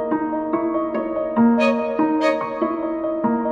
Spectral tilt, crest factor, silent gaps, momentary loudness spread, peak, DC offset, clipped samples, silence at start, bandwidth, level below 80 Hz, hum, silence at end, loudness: -7 dB/octave; 14 dB; none; 7 LU; -6 dBFS; under 0.1%; under 0.1%; 0 s; 7.8 kHz; -56 dBFS; none; 0 s; -21 LUFS